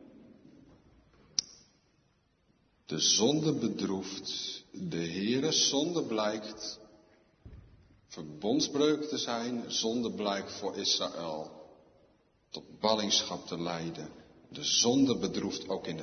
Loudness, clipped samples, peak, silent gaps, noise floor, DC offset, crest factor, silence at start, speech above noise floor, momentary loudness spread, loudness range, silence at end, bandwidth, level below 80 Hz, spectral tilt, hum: -31 LUFS; under 0.1%; -10 dBFS; none; -71 dBFS; under 0.1%; 24 dB; 0 s; 39 dB; 16 LU; 4 LU; 0 s; 6.6 kHz; -68 dBFS; -3 dB/octave; none